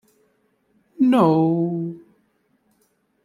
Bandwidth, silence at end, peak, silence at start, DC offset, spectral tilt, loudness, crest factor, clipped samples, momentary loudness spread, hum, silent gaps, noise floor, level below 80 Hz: 12.5 kHz; 1.25 s; -4 dBFS; 1 s; under 0.1%; -9 dB/octave; -19 LUFS; 20 dB; under 0.1%; 16 LU; none; none; -66 dBFS; -68 dBFS